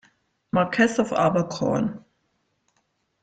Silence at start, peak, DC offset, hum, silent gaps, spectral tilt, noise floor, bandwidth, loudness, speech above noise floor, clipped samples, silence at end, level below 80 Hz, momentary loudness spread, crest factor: 0.55 s; -6 dBFS; under 0.1%; none; none; -6 dB/octave; -72 dBFS; 9.2 kHz; -23 LUFS; 50 dB; under 0.1%; 1.25 s; -58 dBFS; 7 LU; 18 dB